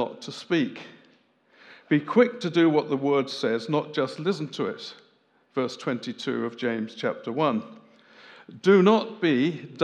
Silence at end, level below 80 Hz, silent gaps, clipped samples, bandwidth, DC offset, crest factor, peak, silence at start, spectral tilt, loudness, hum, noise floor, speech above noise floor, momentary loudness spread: 0 s; -86 dBFS; none; under 0.1%; 9.8 kHz; under 0.1%; 20 dB; -6 dBFS; 0 s; -6.5 dB/octave; -25 LUFS; none; -64 dBFS; 39 dB; 11 LU